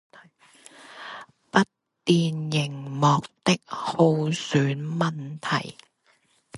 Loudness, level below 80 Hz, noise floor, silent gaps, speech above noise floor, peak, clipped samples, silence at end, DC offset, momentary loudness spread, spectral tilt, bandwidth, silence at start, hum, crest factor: -25 LUFS; -66 dBFS; -65 dBFS; none; 41 dB; -4 dBFS; under 0.1%; 0 s; under 0.1%; 18 LU; -5.5 dB/octave; 11.5 kHz; 0.8 s; none; 22 dB